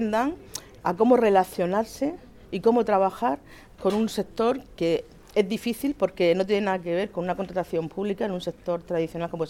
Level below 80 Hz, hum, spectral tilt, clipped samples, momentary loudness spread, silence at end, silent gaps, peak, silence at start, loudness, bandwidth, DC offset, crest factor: -54 dBFS; none; -6 dB/octave; under 0.1%; 9 LU; 0 s; none; -6 dBFS; 0 s; -25 LUFS; 17.5 kHz; under 0.1%; 18 dB